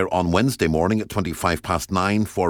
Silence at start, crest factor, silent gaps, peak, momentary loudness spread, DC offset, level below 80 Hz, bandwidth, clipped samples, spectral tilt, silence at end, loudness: 0 s; 16 dB; none; -4 dBFS; 4 LU; under 0.1%; -40 dBFS; 19 kHz; under 0.1%; -5.5 dB/octave; 0 s; -21 LUFS